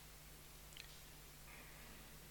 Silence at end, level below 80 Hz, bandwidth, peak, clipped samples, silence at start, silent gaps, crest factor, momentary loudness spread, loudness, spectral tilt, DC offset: 0 s; -64 dBFS; 18 kHz; -34 dBFS; under 0.1%; 0 s; none; 24 dB; 3 LU; -57 LUFS; -2.5 dB/octave; under 0.1%